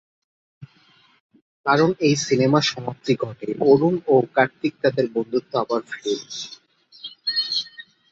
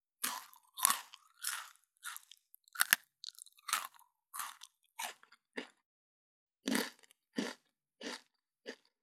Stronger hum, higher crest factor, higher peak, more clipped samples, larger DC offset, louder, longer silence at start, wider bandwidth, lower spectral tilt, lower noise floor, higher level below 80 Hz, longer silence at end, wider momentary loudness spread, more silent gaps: neither; second, 20 dB vs 40 dB; about the same, -4 dBFS vs -4 dBFS; neither; neither; first, -21 LUFS vs -38 LUFS; first, 0.6 s vs 0.2 s; second, 8 kHz vs 18 kHz; first, -5 dB/octave vs -0.5 dB/octave; second, -57 dBFS vs -68 dBFS; first, -64 dBFS vs under -90 dBFS; about the same, 0.3 s vs 0.3 s; second, 12 LU vs 21 LU; second, 1.20-1.29 s, 1.42-1.64 s vs 5.86-6.47 s